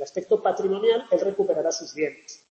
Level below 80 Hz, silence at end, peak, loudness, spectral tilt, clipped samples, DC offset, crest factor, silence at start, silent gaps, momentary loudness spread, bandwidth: -72 dBFS; 0.15 s; -10 dBFS; -24 LUFS; -4 dB/octave; under 0.1%; under 0.1%; 16 dB; 0 s; none; 8 LU; 8 kHz